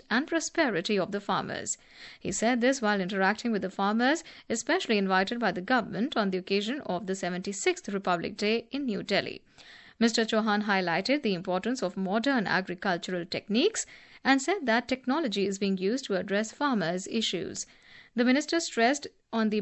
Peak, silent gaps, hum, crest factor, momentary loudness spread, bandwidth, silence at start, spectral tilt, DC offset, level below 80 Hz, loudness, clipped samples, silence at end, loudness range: -10 dBFS; none; none; 18 dB; 8 LU; 8.4 kHz; 0.1 s; -4 dB/octave; under 0.1%; -68 dBFS; -28 LUFS; under 0.1%; 0 s; 2 LU